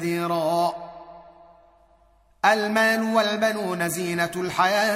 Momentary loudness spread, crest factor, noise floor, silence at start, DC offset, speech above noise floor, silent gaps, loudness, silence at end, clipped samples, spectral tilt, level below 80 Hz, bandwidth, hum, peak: 7 LU; 18 dB; -59 dBFS; 0 s; under 0.1%; 36 dB; none; -23 LUFS; 0 s; under 0.1%; -4 dB/octave; -64 dBFS; 16 kHz; none; -6 dBFS